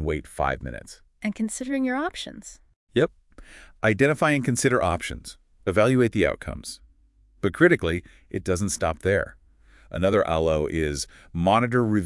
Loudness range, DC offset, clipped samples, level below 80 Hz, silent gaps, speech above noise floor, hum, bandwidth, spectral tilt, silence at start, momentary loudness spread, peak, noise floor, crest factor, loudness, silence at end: 5 LU; under 0.1%; under 0.1%; -46 dBFS; 2.76-2.87 s; 35 dB; none; 12 kHz; -5.5 dB/octave; 0 s; 16 LU; -4 dBFS; -58 dBFS; 20 dB; -24 LUFS; 0 s